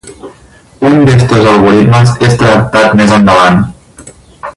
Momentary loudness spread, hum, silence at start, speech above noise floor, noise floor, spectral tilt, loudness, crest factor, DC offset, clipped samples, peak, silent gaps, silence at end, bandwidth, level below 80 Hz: 6 LU; none; 0.05 s; 33 dB; -38 dBFS; -6.5 dB/octave; -6 LUFS; 8 dB; under 0.1%; 0.7%; 0 dBFS; none; 0.05 s; 11.5 kHz; -32 dBFS